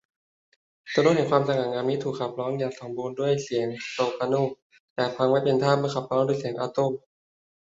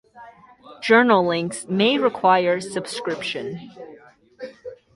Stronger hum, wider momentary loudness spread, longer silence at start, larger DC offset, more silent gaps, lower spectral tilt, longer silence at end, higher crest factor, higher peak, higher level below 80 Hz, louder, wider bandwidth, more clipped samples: neither; second, 9 LU vs 23 LU; first, 0.85 s vs 0.15 s; neither; first, 4.62-4.70 s, 4.80-4.96 s vs none; first, -6 dB/octave vs -4.5 dB/octave; first, 0.8 s vs 0.2 s; about the same, 22 dB vs 20 dB; about the same, -4 dBFS vs -2 dBFS; about the same, -68 dBFS vs -64 dBFS; second, -26 LUFS vs -20 LUFS; second, 8 kHz vs 11.5 kHz; neither